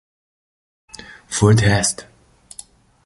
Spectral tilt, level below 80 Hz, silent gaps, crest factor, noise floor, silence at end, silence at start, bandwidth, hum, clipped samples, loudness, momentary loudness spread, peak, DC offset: -4.5 dB/octave; -42 dBFS; none; 20 dB; -43 dBFS; 1.05 s; 1.3 s; 11.5 kHz; none; under 0.1%; -16 LUFS; 24 LU; -2 dBFS; under 0.1%